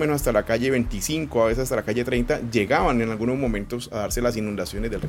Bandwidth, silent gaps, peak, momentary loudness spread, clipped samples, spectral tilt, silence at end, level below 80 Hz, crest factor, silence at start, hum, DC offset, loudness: 17 kHz; none; -6 dBFS; 8 LU; under 0.1%; -5 dB/octave; 0 s; -36 dBFS; 18 dB; 0 s; none; under 0.1%; -24 LUFS